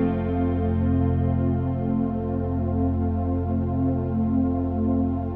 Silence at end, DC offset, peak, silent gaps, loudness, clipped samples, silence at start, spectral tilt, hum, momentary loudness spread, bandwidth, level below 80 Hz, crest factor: 0 s; under 0.1%; -12 dBFS; none; -24 LUFS; under 0.1%; 0 s; -12.5 dB/octave; none; 3 LU; 3.3 kHz; -36 dBFS; 12 dB